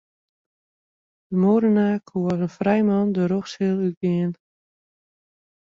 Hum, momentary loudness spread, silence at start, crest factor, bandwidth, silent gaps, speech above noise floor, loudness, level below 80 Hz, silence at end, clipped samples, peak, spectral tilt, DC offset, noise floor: none; 7 LU; 1.3 s; 16 dB; 7.2 kHz; 3.97-4.01 s; over 69 dB; -22 LUFS; -62 dBFS; 1.45 s; under 0.1%; -6 dBFS; -8.5 dB/octave; under 0.1%; under -90 dBFS